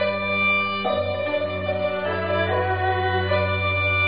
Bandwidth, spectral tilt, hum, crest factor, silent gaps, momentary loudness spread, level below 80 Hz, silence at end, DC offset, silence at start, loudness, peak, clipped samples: 5 kHz; -3 dB/octave; none; 12 dB; none; 5 LU; -50 dBFS; 0 s; 0.5%; 0 s; -22 LUFS; -10 dBFS; under 0.1%